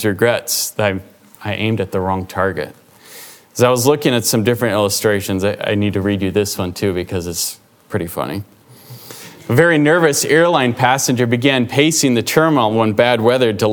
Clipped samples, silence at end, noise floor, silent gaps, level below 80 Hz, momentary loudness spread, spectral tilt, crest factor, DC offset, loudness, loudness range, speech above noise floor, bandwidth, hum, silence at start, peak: under 0.1%; 0 s; -39 dBFS; none; -52 dBFS; 13 LU; -4.5 dB/octave; 16 dB; under 0.1%; -15 LUFS; 7 LU; 24 dB; over 20 kHz; none; 0 s; 0 dBFS